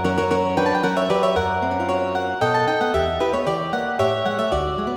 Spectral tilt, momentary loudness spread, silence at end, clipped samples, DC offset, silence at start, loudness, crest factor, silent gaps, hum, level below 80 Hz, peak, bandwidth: -5.5 dB/octave; 3 LU; 0 s; under 0.1%; under 0.1%; 0 s; -21 LUFS; 14 dB; none; none; -40 dBFS; -6 dBFS; 19 kHz